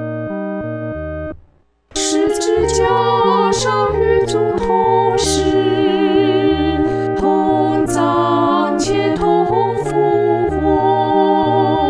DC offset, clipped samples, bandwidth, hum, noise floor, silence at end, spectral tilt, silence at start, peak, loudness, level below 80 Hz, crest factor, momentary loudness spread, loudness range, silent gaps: under 0.1%; under 0.1%; 11 kHz; none; -51 dBFS; 0 s; -5 dB/octave; 0 s; -2 dBFS; -15 LUFS; -36 dBFS; 12 dB; 9 LU; 2 LU; none